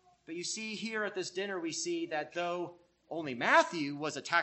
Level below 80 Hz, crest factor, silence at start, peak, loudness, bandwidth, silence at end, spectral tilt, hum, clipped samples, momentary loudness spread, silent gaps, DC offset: -82 dBFS; 22 dB; 0.3 s; -12 dBFS; -34 LUFS; 8.4 kHz; 0 s; -3 dB/octave; none; under 0.1%; 13 LU; none; under 0.1%